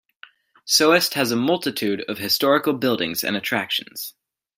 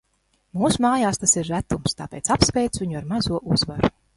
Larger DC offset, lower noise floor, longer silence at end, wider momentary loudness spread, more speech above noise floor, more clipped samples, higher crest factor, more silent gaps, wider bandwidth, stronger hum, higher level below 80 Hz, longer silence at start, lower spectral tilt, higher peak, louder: neither; second, -50 dBFS vs -67 dBFS; first, 0.45 s vs 0.25 s; first, 12 LU vs 8 LU; second, 29 dB vs 46 dB; neither; about the same, 20 dB vs 22 dB; neither; first, 16.5 kHz vs 11.5 kHz; neither; second, -68 dBFS vs -40 dBFS; about the same, 0.65 s vs 0.55 s; about the same, -3 dB/octave vs -4 dB/octave; about the same, -2 dBFS vs 0 dBFS; about the same, -20 LUFS vs -22 LUFS